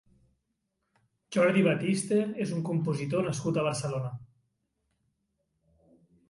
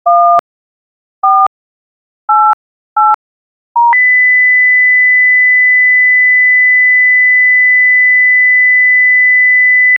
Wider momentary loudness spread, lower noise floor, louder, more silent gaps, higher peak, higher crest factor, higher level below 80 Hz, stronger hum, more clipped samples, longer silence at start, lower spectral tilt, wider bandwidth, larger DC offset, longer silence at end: about the same, 9 LU vs 7 LU; second, -80 dBFS vs under -90 dBFS; second, -29 LUFS vs -6 LUFS; second, none vs 0.39-1.22 s, 1.47-2.28 s, 2.53-2.96 s, 3.14-3.75 s; second, -12 dBFS vs 0 dBFS; first, 18 dB vs 8 dB; about the same, -68 dBFS vs -68 dBFS; neither; neither; first, 1.3 s vs 0.05 s; first, -6 dB/octave vs -3 dB/octave; second, 11.5 kHz vs over 20 kHz; neither; first, 2.05 s vs 0 s